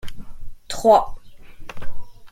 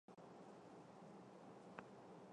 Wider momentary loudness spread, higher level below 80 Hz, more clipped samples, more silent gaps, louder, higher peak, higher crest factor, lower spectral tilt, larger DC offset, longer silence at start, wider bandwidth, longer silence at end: first, 26 LU vs 3 LU; first, -36 dBFS vs under -90 dBFS; neither; neither; first, -17 LUFS vs -61 LUFS; first, -2 dBFS vs -34 dBFS; second, 18 dB vs 28 dB; second, -4.5 dB/octave vs -6 dB/octave; neither; about the same, 0.05 s vs 0.1 s; first, 15.5 kHz vs 10 kHz; about the same, 0.05 s vs 0 s